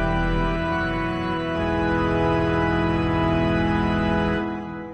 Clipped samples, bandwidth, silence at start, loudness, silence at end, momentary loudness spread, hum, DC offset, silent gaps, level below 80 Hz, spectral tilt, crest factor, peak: under 0.1%; 8.4 kHz; 0 s; -23 LUFS; 0 s; 4 LU; none; under 0.1%; none; -34 dBFS; -7.5 dB/octave; 12 dB; -10 dBFS